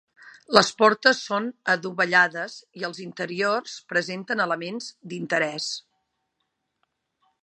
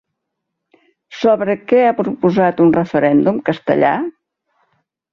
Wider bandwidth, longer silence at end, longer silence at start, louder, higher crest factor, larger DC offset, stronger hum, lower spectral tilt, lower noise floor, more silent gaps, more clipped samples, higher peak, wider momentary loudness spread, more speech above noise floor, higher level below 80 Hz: first, 11.5 kHz vs 6.8 kHz; first, 1.65 s vs 1 s; second, 0.2 s vs 1.1 s; second, -23 LUFS vs -15 LUFS; first, 26 dB vs 16 dB; neither; neither; second, -3 dB/octave vs -8 dB/octave; about the same, -78 dBFS vs -76 dBFS; neither; neither; about the same, 0 dBFS vs -2 dBFS; first, 15 LU vs 6 LU; second, 53 dB vs 63 dB; second, -72 dBFS vs -56 dBFS